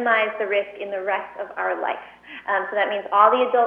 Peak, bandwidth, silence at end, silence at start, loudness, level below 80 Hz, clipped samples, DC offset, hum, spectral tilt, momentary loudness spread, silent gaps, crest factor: -2 dBFS; 5 kHz; 0 s; 0 s; -22 LUFS; -70 dBFS; under 0.1%; under 0.1%; 60 Hz at -60 dBFS; -5.5 dB/octave; 16 LU; none; 20 dB